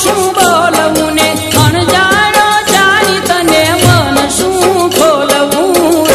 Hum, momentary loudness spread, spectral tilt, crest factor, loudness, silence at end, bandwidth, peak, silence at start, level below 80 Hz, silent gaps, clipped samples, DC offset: none; 3 LU; -3.5 dB/octave; 8 dB; -8 LUFS; 0 s; 16.5 kHz; 0 dBFS; 0 s; -34 dBFS; none; 0.6%; under 0.1%